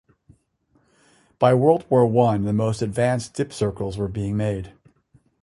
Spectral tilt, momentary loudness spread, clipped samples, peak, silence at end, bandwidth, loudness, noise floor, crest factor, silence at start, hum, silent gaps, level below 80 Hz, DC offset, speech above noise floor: -7.5 dB/octave; 10 LU; under 0.1%; -2 dBFS; 0.7 s; 11.5 kHz; -21 LUFS; -65 dBFS; 20 dB; 1.4 s; none; none; -48 dBFS; under 0.1%; 44 dB